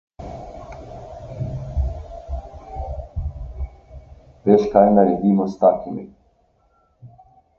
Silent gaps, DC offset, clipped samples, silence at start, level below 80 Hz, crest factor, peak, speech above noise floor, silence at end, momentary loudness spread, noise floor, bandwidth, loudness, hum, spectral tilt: none; under 0.1%; under 0.1%; 0.2 s; -34 dBFS; 22 dB; 0 dBFS; 45 dB; 0.5 s; 22 LU; -61 dBFS; 6.8 kHz; -19 LUFS; none; -10 dB/octave